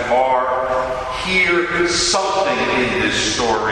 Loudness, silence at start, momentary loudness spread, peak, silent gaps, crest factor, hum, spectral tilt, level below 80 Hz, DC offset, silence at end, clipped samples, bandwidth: -17 LUFS; 0 s; 5 LU; -4 dBFS; none; 12 dB; none; -2.5 dB/octave; -40 dBFS; under 0.1%; 0 s; under 0.1%; 12 kHz